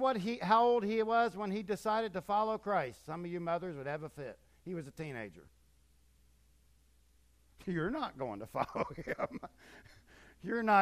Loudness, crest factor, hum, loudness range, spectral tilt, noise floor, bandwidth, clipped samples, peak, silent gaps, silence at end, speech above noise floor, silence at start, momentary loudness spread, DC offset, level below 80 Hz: -35 LUFS; 22 dB; none; 15 LU; -6.5 dB/octave; -68 dBFS; 15 kHz; under 0.1%; -14 dBFS; none; 0 s; 33 dB; 0 s; 16 LU; under 0.1%; -66 dBFS